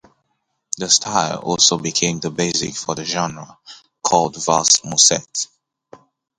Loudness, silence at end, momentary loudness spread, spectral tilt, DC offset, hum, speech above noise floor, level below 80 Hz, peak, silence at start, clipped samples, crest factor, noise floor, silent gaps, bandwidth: -17 LUFS; 0.4 s; 13 LU; -2 dB/octave; under 0.1%; none; 53 dB; -56 dBFS; 0 dBFS; 0.75 s; under 0.1%; 20 dB; -72 dBFS; none; 11.5 kHz